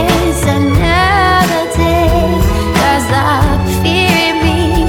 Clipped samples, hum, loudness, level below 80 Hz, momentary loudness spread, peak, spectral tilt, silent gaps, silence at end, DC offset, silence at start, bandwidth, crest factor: under 0.1%; none; -11 LUFS; -20 dBFS; 3 LU; 0 dBFS; -5 dB/octave; none; 0 s; under 0.1%; 0 s; 19 kHz; 10 dB